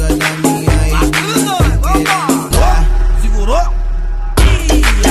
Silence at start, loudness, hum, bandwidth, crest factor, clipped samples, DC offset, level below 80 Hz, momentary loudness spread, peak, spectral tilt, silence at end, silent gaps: 0 s; -13 LUFS; none; 14 kHz; 10 dB; under 0.1%; under 0.1%; -12 dBFS; 5 LU; 0 dBFS; -4.5 dB/octave; 0 s; none